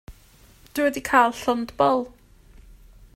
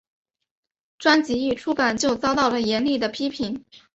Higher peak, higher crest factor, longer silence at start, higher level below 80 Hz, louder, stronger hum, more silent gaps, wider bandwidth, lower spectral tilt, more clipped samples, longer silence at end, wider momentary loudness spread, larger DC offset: about the same, -4 dBFS vs -4 dBFS; about the same, 20 dB vs 20 dB; second, 0.1 s vs 1 s; first, -50 dBFS vs -56 dBFS; about the same, -22 LUFS vs -22 LUFS; neither; neither; first, 16 kHz vs 8.2 kHz; about the same, -4 dB/octave vs -3.5 dB/octave; neither; first, 1.05 s vs 0.15 s; about the same, 10 LU vs 8 LU; neither